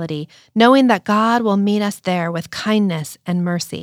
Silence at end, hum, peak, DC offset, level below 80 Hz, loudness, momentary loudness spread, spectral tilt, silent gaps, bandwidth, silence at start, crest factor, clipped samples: 0 s; none; -2 dBFS; under 0.1%; -64 dBFS; -17 LUFS; 12 LU; -5.5 dB/octave; none; 15.5 kHz; 0 s; 16 dB; under 0.1%